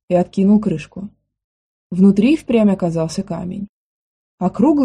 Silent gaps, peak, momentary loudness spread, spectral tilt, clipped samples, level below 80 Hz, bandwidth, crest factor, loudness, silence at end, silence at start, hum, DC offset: 1.44-1.90 s, 3.69-4.38 s; -2 dBFS; 18 LU; -8 dB/octave; under 0.1%; -50 dBFS; 10.5 kHz; 14 dB; -17 LUFS; 0 s; 0.1 s; none; under 0.1%